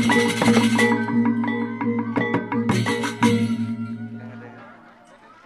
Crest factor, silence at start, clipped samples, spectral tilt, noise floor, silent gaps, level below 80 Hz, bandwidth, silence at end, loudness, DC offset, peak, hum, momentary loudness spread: 18 dB; 0 s; under 0.1%; -5.5 dB/octave; -49 dBFS; none; -58 dBFS; 13.5 kHz; 0.75 s; -21 LUFS; under 0.1%; -4 dBFS; none; 17 LU